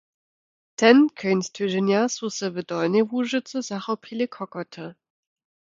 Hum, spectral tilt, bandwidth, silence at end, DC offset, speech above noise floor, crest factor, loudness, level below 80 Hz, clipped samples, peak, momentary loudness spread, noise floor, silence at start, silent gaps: none; -5 dB/octave; 7.8 kHz; 0.85 s; under 0.1%; over 67 dB; 22 dB; -23 LUFS; -74 dBFS; under 0.1%; -2 dBFS; 17 LU; under -90 dBFS; 0.8 s; none